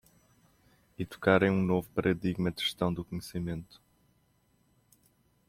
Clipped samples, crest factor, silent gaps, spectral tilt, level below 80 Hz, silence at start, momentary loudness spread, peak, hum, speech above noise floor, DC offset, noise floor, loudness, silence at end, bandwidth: under 0.1%; 22 dB; none; -6.5 dB/octave; -60 dBFS; 1 s; 14 LU; -12 dBFS; none; 40 dB; under 0.1%; -70 dBFS; -31 LUFS; 1.85 s; 15.5 kHz